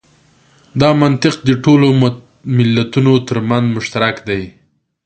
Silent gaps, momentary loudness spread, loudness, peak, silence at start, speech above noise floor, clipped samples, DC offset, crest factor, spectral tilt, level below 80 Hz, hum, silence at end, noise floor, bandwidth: none; 11 LU; -13 LUFS; 0 dBFS; 0.75 s; 38 dB; under 0.1%; under 0.1%; 14 dB; -7 dB/octave; -46 dBFS; none; 0.55 s; -51 dBFS; 9 kHz